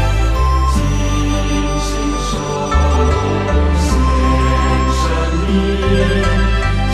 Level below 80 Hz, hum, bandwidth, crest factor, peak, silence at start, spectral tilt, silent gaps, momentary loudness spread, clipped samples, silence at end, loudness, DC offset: -16 dBFS; none; 12.5 kHz; 12 dB; -2 dBFS; 0 s; -5.5 dB/octave; none; 4 LU; under 0.1%; 0 s; -15 LUFS; under 0.1%